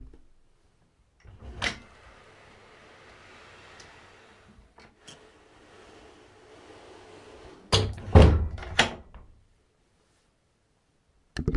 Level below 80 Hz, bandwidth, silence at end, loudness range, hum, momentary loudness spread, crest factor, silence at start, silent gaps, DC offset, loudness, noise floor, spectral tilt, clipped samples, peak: -36 dBFS; 11.5 kHz; 0 s; 15 LU; none; 30 LU; 28 dB; 1.45 s; none; under 0.1%; -24 LUFS; -69 dBFS; -5.5 dB/octave; under 0.1%; -2 dBFS